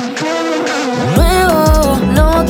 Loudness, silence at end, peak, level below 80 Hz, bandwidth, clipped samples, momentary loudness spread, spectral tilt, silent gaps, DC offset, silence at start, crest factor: -12 LUFS; 0 s; 0 dBFS; -18 dBFS; 18.5 kHz; under 0.1%; 5 LU; -5.5 dB/octave; none; under 0.1%; 0 s; 10 dB